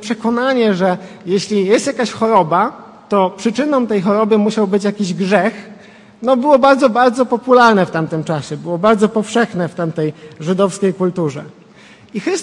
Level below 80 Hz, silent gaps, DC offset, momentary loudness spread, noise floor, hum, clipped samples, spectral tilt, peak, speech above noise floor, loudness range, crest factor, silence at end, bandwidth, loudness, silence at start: -60 dBFS; none; under 0.1%; 11 LU; -42 dBFS; none; under 0.1%; -6 dB/octave; 0 dBFS; 28 dB; 4 LU; 14 dB; 0 s; 11.5 kHz; -15 LUFS; 0 s